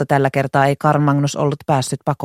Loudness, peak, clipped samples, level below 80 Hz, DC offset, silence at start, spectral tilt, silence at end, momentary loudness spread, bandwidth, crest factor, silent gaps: -17 LUFS; 0 dBFS; under 0.1%; -54 dBFS; under 0.1%; 0 s; -6 dB/octave; 0 s; 4 LU; 14.5 kHz; 16 dB; none